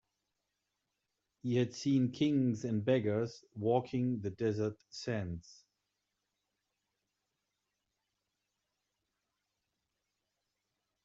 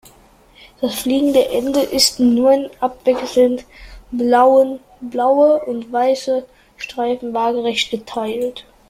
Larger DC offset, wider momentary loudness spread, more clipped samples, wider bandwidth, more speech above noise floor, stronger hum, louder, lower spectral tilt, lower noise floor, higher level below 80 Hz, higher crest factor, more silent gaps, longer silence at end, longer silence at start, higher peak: neither; about the same, 10 LU vs 11 LU; neither; second, 7.8 kHz vs 16 kHz; first, 53 dB vs 32 dB; neither; second, -35 LUFS vs -17 LUFS; first, -7 dB/octave vs -3 dB/octave; first, -86 dBFS vs -49 dBFS; second, -74 dBFS vs -50 dBFS; about the same, 20 dB vs 18 dB; neither; first, 5.5 s vs 0.3 s; first, 1.45 s vs 0.8 s; second, -18 dBFS vs 0 dBFS